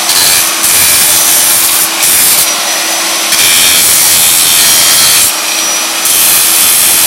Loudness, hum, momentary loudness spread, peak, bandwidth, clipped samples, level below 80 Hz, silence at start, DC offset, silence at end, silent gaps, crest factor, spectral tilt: -4 LUFS; none; 6 LU; 0 dBFS; over 20 kHz; 3%; -44 dBFS; 0 s; under 0.1%; 0 s; none; 8 dB; 1.5 dB/octave